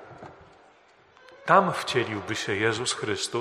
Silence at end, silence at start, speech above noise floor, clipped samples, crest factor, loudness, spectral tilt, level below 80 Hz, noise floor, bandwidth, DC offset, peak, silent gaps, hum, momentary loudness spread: 0 s; 0 s; 32 dB; under 0.1%; 22 dB; -25 LUFS; -3.5 dB/octave; -66 dBFS; -58 dBFS; 13 kHz; under 0.1%; -4 dBFS; none; none; 17 LU